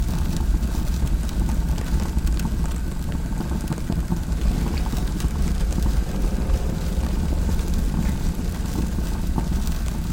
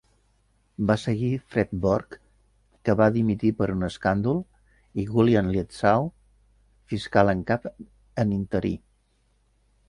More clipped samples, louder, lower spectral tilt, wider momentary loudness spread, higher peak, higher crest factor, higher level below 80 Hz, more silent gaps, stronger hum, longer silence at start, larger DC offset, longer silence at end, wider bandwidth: neither; about the same, -25 LUFS vs -25 LUFS; second, -6.5 dB/octave vs -8 dB/octave; second, 3 LU vs 13 LU; second, -8 dBFS vs -4 dBFS; second, 14 dB vs 22 dB; first, -24 dBFS vs -48 dBFS; neither; neither; second, 0 s vs 0.8 s; first, 0.3% vs under 0.1%; second, 0 s vs 1.1 s; first, 17 kHz vs 11 kHz